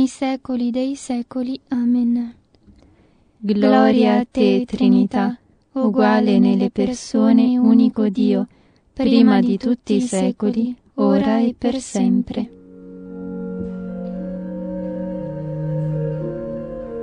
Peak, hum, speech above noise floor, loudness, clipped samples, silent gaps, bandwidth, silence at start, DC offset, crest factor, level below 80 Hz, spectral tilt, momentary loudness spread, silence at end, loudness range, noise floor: -2 dBFS; none; 38 dB; -19 LUFS; under 0.1%; none; 10 kHz; 0 s; under 0.1%; 18 dB; -50 dBFS; -7 dB/octave; 14 LU; 0 s; 10 LU; -54 dBFS